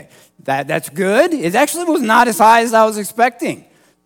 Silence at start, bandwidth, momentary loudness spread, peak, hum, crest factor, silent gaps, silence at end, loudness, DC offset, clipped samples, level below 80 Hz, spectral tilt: 0.45 s; 18 kHz; 13 LU; 0 dBFS; none; 14 dB; none; 0.5 s; -14 LUFS; under 0.1%; under 0.1%; -62 dBFS; -4 dB/octave